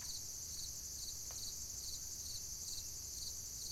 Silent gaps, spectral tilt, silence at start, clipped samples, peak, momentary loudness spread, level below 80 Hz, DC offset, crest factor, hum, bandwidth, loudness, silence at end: none; -0.5 dB/octave; 0 s; under 0.1%; -32 dBFS; 1 LU; -60 dBFS; under 0.1%; 14 dB; none; 16 kHz; -44 LUFS; 0 s